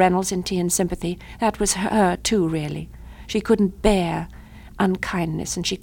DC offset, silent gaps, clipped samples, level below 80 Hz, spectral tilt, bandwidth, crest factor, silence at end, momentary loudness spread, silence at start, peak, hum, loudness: under 0.1%; none; under 0.1%; -38 dBFS; -4.5 dB/octave; 18 kHz; 20 dB; 0.05 s; 11 LU; 0 s; -2 dBFS; none; -22 LUFS